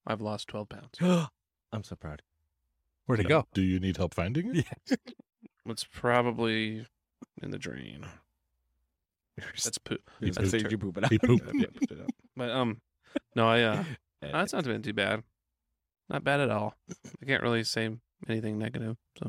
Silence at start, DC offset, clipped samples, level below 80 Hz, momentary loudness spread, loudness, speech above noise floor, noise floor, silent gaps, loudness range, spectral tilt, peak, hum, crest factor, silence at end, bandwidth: 0.05 s; under 0.1%; under 0.1%; -58 dBFS; 17 LU; -31 LUFS; 55 dB; -85 dBFS; none; 5 LU; -5.5 dB/octave; -10 dBFS; none; 22 dB; 0 s; 15.5 kHz